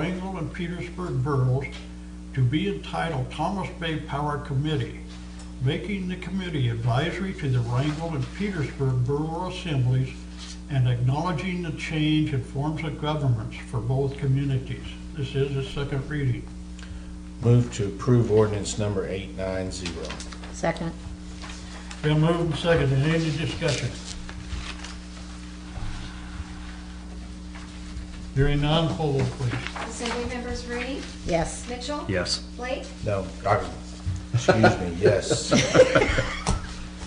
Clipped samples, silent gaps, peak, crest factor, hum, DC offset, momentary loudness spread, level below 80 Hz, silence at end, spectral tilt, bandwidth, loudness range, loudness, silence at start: under 0.1%; none; -6 dBFS; 20 dB; none; under 0.1%; 16 LU; -38 dBFS; 0 s; -6 dB/octave; 10 kHz; 6 LU; -26 LUFS; 0 s